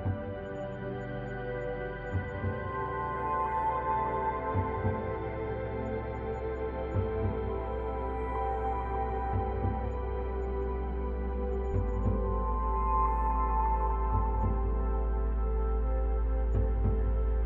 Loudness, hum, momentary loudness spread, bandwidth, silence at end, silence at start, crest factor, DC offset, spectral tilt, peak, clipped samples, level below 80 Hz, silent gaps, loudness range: -33 LUFS; none; 6 LU; 3.7 kHz; 0 s; 0 s; 14 dB; under 0.1%; -10 dB/octave; -16 dBFS; under 0.1%; -34 dBFS; none; 4 LU